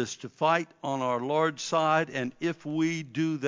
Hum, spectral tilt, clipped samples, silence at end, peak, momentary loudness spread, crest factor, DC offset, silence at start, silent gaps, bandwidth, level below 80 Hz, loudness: none; -5 dB/octave; under 0.1%; 0 s; -10 dBFS; 7 LU; 18 dB; under 0.1%; 0 s; none; 7.6 kHz; -76 dBFS; -28 LUFS